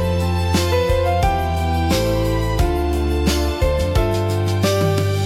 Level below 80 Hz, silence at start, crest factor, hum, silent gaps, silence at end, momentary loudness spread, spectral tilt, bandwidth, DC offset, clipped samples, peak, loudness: -26 dBFS; 0 s; 12 dB; none; none; 0 s; 2 LU; -6 dB/octave; 16 kHz; under 0.1%; under 0.1%; -6 dBFS; -19 LUFS